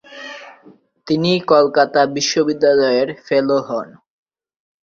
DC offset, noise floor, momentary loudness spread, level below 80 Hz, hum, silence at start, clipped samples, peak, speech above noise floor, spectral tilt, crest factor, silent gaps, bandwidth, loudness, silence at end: under 0.1%; -48 dBFS; 19 LU; -60 dBFS; none; 0.1 s; under 0.1%; -2 dBFS; 33 dB; -4.5 dB/octave; 16 dB; none; 7.6 kHz; -16 LUFS; 1 s